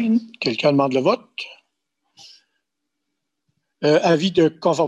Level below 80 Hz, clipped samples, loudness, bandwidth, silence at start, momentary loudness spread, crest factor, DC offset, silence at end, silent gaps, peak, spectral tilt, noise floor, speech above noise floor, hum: -64 dBFS; under 0.1%; -19 LUFS; 11 kHz; 0 s; 13 LU; 18 dB; under 0.1%; 0 s; none; -4 dBFS; -6 dB/octave; -79 dBFS; 61 dB; none